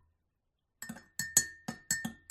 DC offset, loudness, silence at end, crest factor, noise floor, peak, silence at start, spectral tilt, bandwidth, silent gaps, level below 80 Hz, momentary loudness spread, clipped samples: under 0.1%; -32 LUFS; 0.15 s; 30 dB; -82 dBFS; -8 dBFS; 0.8 s; -0.5 dB/octave; 16 kHz; none; -70 dBFS; 18 LU; under 0.1%